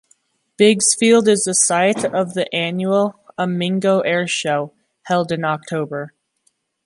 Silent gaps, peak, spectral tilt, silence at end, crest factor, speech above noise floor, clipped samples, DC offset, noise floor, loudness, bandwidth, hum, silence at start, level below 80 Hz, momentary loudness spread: none; 0 dBFS; -3.5 dB/octave; 0.75 s; 18 dB; 48 dB; under 0.1%; under 0.1%; -65 dBFS; -17 LUFS; 11.5 kHz; none; 0.6 s; -66 dBFS; 11 LU